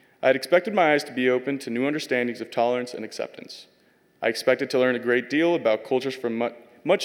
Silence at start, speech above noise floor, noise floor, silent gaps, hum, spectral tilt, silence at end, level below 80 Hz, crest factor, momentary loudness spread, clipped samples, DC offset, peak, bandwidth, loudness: 0.2 s; 38 dB; -61 dBFS; none; none; -4.5 dB/octave; 0 s; -82 dBFS; 18 dB; 13 LU; under 0.1%; under 0.1%; -6 dBFS; 16.5 kHz; -24 LUFS